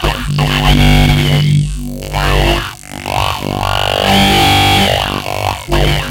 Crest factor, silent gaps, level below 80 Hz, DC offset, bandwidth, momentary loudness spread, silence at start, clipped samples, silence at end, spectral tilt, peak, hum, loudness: 12 dB; none; -20 dBFS; under 0.1%; 17 kHz; 10 LU; 0 s; under 0.1%; 0 s; -4.5 dB/octave; 0 dBFS; none; -12 LUFS